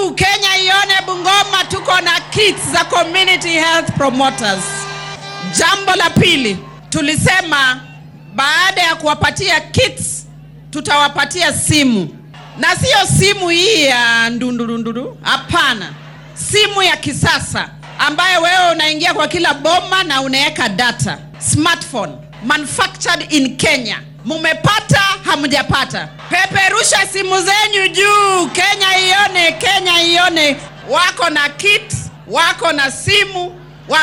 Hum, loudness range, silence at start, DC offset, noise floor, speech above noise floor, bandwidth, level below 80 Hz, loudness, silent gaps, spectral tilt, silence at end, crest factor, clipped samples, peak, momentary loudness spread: none; 4 LU; 0 s; under 0.1%; -36 dBFS; 22 dB; 17.5 kHz; -42 dBFS; -12 LUFS; none; -2.5 dB/octave; 0 s; 12 dB; under 0.1%; -2 dBFS; 11 LU